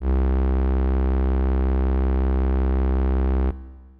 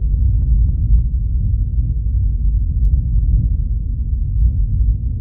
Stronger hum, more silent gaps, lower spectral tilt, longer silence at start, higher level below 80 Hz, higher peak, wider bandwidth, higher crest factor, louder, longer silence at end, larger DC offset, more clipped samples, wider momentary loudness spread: neither; neither; second, -11.5 dB/octave vs -17 dB/octave; about the same, 0 s vs 0 s; about the same, -20 dBFS vs -16 dBFS; second, -16 dBFS vs -4 dBFS; first, 3.4 kHz vs 0.6 kHz; second, 4 dB vs 12 dB; second, -23 LUFS vs -18 LUFS; first, 0.2 s vs 0 s; neither; neither; second, 1 LU vs 4 LU